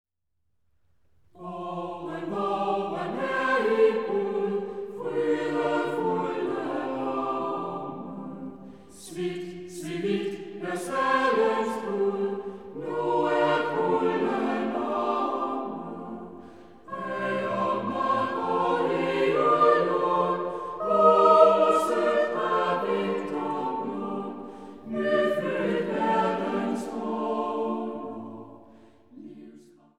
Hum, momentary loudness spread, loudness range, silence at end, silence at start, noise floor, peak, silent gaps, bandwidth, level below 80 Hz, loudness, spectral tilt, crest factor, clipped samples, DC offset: none; 16 LU; 10 LU; 0.35 s; 1.4 s; -78 dBFS; -4 dBFS; none; 13.5 kHz; -68 dBFS; -26 LUFS; -6 dB/octave; 22 dB; under 0.1%; 0.2%